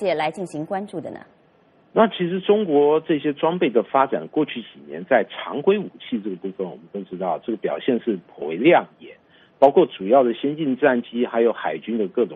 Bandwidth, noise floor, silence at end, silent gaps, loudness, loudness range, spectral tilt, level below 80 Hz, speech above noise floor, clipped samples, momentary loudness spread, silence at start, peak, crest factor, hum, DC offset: 10.5 kHz; -57 dBFS; 0 s; none; -21 LUFS; 5 LU; -7.5 dB/octave; -70 dBFS; 36 dB; under 0.1%; 14 LU; 0 s; 0 dBFS; 20 dB; none; under 0.1%